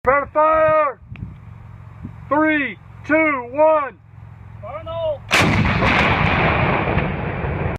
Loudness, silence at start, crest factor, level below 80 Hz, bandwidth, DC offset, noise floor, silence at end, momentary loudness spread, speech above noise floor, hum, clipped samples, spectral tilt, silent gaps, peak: -17 LUFS; 0.05 s; 18 dB; -34 dBFS; 15 kHz; under 0.1%; -39 dBFS; 0 s; 20 LU; 21 dB; none; under 0.1%; -6 dB/octave; none; 0 dBFS